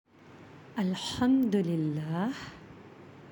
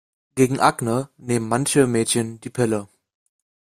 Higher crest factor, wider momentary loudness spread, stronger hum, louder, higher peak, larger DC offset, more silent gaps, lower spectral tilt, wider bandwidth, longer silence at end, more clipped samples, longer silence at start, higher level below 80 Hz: about the same, 16 dB vs 20 dB; first, 25 LU vs 9 LU; neither; second, -30 LUFS vs -21 LUFS; second, -16 dBFS vs -2 dBFS; neither; neither; first, -6.5 dB/octave vs -5 dB/octave; about the same, 17 kHz vs 15.5 kHz; second, 0 s vs 0.95 s; neither; about the same, 0.25 s vs 0.35 s; second, -64 dBFS vs -58 dBFS